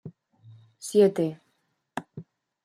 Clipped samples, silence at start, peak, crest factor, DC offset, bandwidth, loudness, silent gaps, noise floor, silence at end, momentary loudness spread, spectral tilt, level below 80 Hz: under 0.1%; 0.05 s; -8 dBFS; 20 dB; under 0.1%; 14.5 kHz; -24 LUFS; none; -74 dBFS; 0.4 s; 26 LU; -6 dB/octave; -76 dBFS